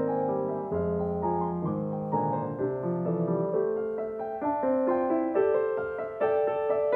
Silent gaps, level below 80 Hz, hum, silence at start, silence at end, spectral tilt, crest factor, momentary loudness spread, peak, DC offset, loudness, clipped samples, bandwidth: none; -58 dBFS; none; 0 s; 0 s; -11.5 dB/octave; 14 dB; 5 LU; -14 dBFS; under 0.1%; -29 LUFS; under 0.1%; 3.8 kHz